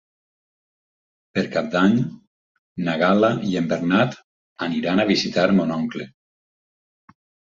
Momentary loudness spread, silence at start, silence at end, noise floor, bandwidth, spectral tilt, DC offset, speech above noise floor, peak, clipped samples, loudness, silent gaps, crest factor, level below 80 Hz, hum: 12 LU; 1.35 s; 1.5 s; under -90 dBFS; 7.6 kHz; -6.5 dB/octave; under 0.1%; over 70 dB; -4 dBFS; under 0.1%; -21 LUFS; 2.27-2.75 s, 4.24-4.56 s; 18 dB; -60 dBFS; none